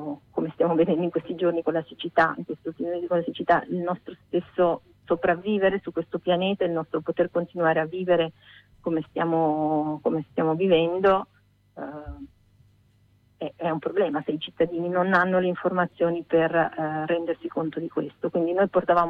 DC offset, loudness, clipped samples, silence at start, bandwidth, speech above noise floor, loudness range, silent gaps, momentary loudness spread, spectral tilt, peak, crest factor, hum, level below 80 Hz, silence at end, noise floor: under 0.1%; -25 LUFS; under 0.1%; 0 s; 5.4 kHz; 37 dB; 3 LU; none; 10 LU; -8.5 dB/octave; -10 dBFS; 16 dB; none; -58 dBFS; 0 s; -61 dBFS